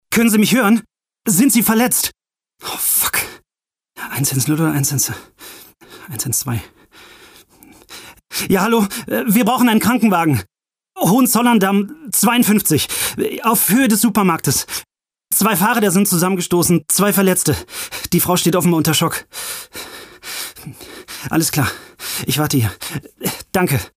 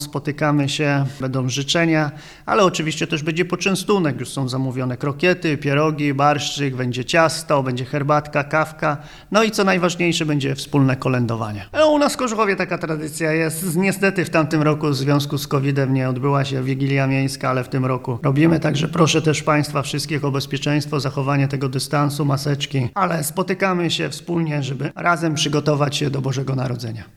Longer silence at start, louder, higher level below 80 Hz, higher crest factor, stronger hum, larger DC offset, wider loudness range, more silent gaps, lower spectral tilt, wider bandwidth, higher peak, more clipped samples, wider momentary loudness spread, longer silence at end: about the same, 0.1 s vs 0 s; first, -16 LUFS vs -20 LUFS; about the same, -48 dBFS vs -50 dBFS; about the same, 14 dB vs 18 dB; neither; neither; first, 6 LU vs 2 LU; neither; second, -4 dB/octave vs -5.5 dB/octave; first, 16 kHz vs 14.5 kHz; second, -4 dBFS vs 0 dBFS; neither; first, 15 LU vs 6 LU; about the same, 0.1 s vs 0.1 s